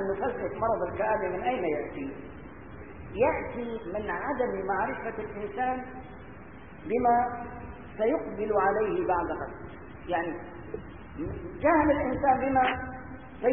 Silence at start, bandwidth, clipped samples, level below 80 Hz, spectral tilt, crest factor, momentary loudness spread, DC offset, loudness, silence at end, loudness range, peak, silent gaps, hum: 0 s; 3.6 kHz; under 0.1%; -50 dBFS; -10.5 dB/octave; 18 dB; 19 LU; 0.3%; -29 LUFS; 0 s; 4 LU; -12 dBFS; none; none